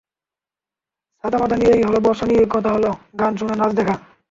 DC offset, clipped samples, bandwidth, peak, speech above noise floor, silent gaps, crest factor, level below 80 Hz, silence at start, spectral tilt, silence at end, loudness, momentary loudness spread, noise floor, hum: under 0.1%; under 0.1%; 7.6 kHz; -4 dBFS; 72 dB; none; 16 dB; -46 dBFS; 1.25 s; -7 dB/octave; 0.3 s; -18 LUFS; 8 LU; -90 dBFS; none